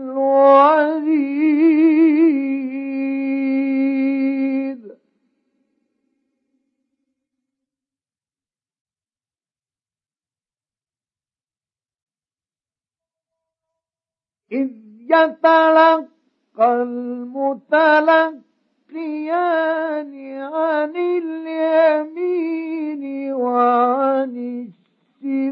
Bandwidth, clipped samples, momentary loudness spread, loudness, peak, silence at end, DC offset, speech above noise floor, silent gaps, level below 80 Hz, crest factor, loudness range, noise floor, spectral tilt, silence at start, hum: 5.8 kHz; under 0.1%; 14 LU; -17 LUFS; 0 dBFS; 0 s; under 0.1%; over 72 dB; 8.81-8.85 s, 12.02-12.07 s; -88 dBFS; 18 dB; 8 LU; under -90 dBFS; -7 dB/octave; 0 s; none